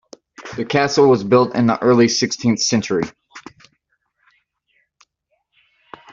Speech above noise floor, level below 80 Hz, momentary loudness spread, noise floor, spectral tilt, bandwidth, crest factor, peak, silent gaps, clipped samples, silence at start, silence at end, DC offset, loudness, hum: 55 dB; -56 dBFS; 15 LU; -70 dBFS; -4.5 dB/octave; 7.6 kHz; 16 dB; -2 dBFS; none; under 0.1%; 0.4 s; 2.7 s; under 0.1%; -16 LUFS; none